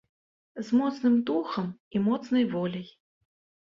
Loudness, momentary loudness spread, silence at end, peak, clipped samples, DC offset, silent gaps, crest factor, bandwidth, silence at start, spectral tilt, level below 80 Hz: -27 LUFS; 15 LU; 0.75 s; -14 dBFS; under 0.1%; under 0.1%; 1.80-1.91 s; 14 dB; 7.2 kHz; 0.55 s; -7.5 dB/octave; -70 dBFS